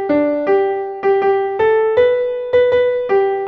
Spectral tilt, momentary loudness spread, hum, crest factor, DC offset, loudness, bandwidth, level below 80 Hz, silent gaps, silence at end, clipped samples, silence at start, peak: -7 dB/octave; 4 LU; none; 12 dB; under 0.1%; -15 LUFS; 5.4 kHz; -52 dBFS; none; 0 s; under 0.1%; 0 s; -4 dBFS